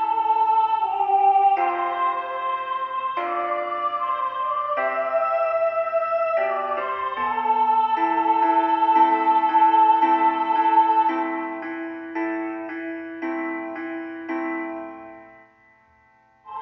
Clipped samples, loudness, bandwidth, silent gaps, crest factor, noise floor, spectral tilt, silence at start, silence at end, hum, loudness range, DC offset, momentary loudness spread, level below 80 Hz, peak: under 0.1%; -22 LUFS; 5.8 kHz; none; 14 dB; -58 dBFS; -1 dB/octave; 0 s; 0 s; none; 11 LU; under 0.1%; 13 LU; -70 dBFS; -8 dBFS